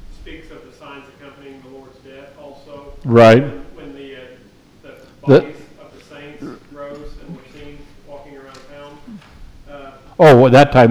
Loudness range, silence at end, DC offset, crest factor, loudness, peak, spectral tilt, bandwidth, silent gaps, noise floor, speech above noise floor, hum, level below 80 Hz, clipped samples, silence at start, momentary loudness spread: 21 LU; 0 s; under 0.1%; 16 dB; -10 LUFS; 0 dBFS; -7.5 dB/octave; 13.5 kHz; none; -43 dBFS; 30 dB; none; -42 dBFS; under 0.1%; 3.05 s; 29 LU